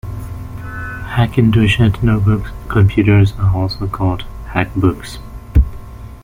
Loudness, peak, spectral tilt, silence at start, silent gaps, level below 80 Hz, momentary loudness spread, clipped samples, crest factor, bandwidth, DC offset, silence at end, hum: -15 LUFS; 0 dBFS; -7.5 dB/octave; 0.05 s; none; -24 dBFS; 16 LU; under 0.1%; 14 dB; 15.5 kHz; under 0.1%; 0 s; none